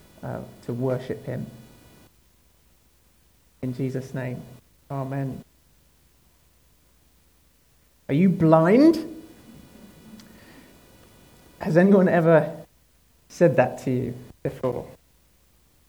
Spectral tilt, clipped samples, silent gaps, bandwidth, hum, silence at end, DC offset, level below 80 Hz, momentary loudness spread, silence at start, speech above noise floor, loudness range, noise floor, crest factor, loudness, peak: -8.5 dB/octave; under 0.1%; none; 19.5 kHz; none; 0.95 s; under 0.1%; -58 dBFS; 19 LU; 0.2 s; 40 dB; 14 LU; -61 dBFS; 22 dB; -23 LUFS; -2 dBFS